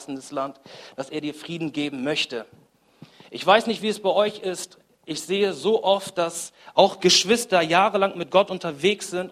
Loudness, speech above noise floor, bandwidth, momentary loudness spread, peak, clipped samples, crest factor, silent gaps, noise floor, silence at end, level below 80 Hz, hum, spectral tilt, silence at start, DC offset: -22 LUFS; 28 dB; 15.5 kHz; 15 LU; -2 dBFS; under 0.1%; 22 dB; none; -51 dBFS; 0 s; -70 dBFS; none; -3 dB/octave; 0 s; under 0.1%